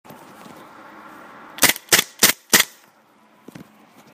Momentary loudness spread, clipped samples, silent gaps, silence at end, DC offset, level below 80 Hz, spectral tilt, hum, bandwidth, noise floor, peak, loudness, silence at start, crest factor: 7 LU; under 0.1%; none; 1.5 s; under 0.1%; -60 dBFS; 0 dB/octave; none; 16 kHz; -55 dBFS; 0 dBFS; -16 LUFS; 1.6 s; 24 dB